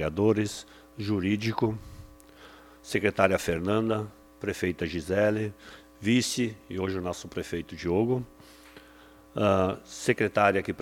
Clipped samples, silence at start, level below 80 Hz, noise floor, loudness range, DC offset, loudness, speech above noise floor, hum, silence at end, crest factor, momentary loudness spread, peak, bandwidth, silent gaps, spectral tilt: under 0.1%; 0 s; -54 dBFS; -53 dBFS; 2 LU; under 0.1%; -28 LUFS; 26 dB; none; 0 s; 24 dB; 15 LU; -6 dBFS; 17.5 kHz; none; -5.5 dB/octave